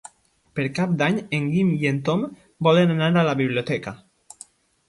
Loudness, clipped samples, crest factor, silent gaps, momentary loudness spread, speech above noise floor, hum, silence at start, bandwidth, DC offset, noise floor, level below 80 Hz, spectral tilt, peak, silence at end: -22 LUFS; under 0.1%; 18 dB; none; 10 LU; 36 dB; none; 0.55 s; 11.5 kHz; under 0.1%; -57 dBFS; -60 dBFS; -7 dB/octave; -6 dBFS; 0.9 s